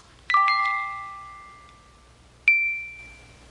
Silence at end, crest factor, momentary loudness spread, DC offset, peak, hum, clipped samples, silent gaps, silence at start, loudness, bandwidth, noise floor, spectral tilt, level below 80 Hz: 0.35 s; 20 dB; 23 LU; under 0.1%; -6 dBFS; none; under 0.1%; none; 0.3 s; -22 LUFS; 11 kHz; -53 dBFS; -1 dB/octave; -58 dBFS